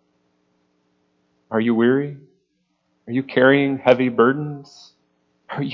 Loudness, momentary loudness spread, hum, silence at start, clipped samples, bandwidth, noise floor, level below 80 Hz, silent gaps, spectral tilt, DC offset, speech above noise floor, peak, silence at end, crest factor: -19 LUFS; 16 LU; none; 1.5 s; under 0.1%; 7 kHz; -69 dBFS; -68 dBFS; none; -8 dB/octave; under 0.1%; 51 dB; 0 dBFS; 0 s; 20 dB